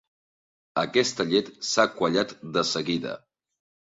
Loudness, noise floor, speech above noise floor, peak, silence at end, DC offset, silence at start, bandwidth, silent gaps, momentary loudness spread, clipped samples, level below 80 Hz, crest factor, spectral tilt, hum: -25 LUFS; under -90 dBFS; over 65 dB; -6 dBFS; 0.8 s; under 0.1%; 0.75 s; 7.8 kHz; none; 8 LU; under 0.1%; -66 dBFS; 20 dB; -3.5 dB/octave; none